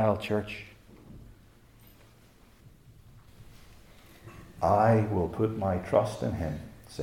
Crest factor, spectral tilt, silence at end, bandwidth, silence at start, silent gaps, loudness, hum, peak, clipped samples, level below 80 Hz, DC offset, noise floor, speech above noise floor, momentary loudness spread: 20 dB; -7.5 dB/octave; 0 s; 16 kHz; 0 s; none; -28 LUFS; none; -10 dBFS; under 0.1%; -56 dBFS; under 0.1%; -58 dBFS; 30 dB; 26 LU